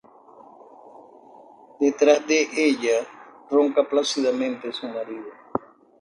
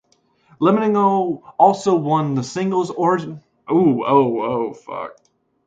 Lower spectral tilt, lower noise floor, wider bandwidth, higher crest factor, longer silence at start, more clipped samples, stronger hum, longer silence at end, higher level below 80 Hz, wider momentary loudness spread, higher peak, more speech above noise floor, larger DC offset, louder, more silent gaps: second, -2.5 dB/octave vs -7 dB/octave; second, -49 dBFS vs -59 dBFS; first, 10.5 kHz vs 9.2 kHz; about the same, 20 dB vs 18 dB; first, 0.85 s vs 0.6 s; neither; neither; second, 0.4 s vs 0.55 s; second, -70 dBFS vs -62 dBFS; about the same, 13 LU vs 15 LU; second, -4 dBFS vs 0 dBFS; second, 28 dB vs 42 dB; neither; second, -22 LUFS vs -18 LUFS; neither